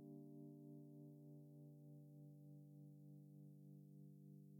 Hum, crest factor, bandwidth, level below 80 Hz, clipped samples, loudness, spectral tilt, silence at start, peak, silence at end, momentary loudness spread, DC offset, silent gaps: 50 Hz at -85 dBFS; 12 dB; 18 kHz; under -90 dBFS; under 0.1%; -62 LUFS; -10 dB/octave; 0 s; -48 dBFS; 0 s; 3 LU; under 0.1%; none